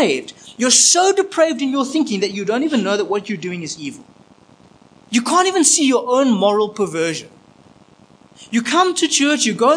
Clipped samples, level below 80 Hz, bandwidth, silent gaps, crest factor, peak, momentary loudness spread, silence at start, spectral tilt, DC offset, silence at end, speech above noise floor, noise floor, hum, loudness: under 0.1%; -68 dBFS; 10.5 kHz; none; 18 dB; 0 dBFS; 13 LU; 0 s; -2.5 dB/octave; under 0.1%; 0 s; 32 dB; -49 dBFS; none; -16 LUFS